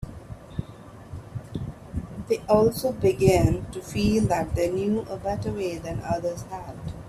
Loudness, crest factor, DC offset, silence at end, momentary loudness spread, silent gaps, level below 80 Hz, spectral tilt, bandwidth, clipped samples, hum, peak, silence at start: -25 LUFS; 20 dB; under 0.1%; 0 s; 18 LU; none; -42 dBFS; -6.5 dB/octave; 15.5 kHz; under 0.1%; none; -6 dBFS; 0 s